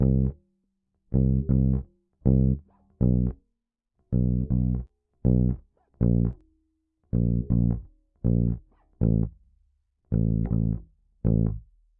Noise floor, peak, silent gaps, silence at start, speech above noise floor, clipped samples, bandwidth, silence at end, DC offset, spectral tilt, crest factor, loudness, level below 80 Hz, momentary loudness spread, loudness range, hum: -81 dBFS; -8 dBFS; none; 0 s; 58 dB; under 0.1%; 1.7 kHz; 0.4 s; under 0.1%; -16 dB/octave; 18 dB; -26 LUFS; -32 dBFS; 9 LU; 2 LU; none